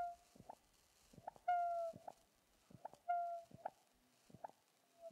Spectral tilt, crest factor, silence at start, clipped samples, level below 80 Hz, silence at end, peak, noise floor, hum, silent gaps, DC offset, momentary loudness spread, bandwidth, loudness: -5 dB/octave; 20 dB; 0 s; under 0.1%; -84 dBFS; 0 s; -28 dBFS; -76 dBFS; none; none; under 0.1%; 22 LU; 15 kHz; -45 LUFS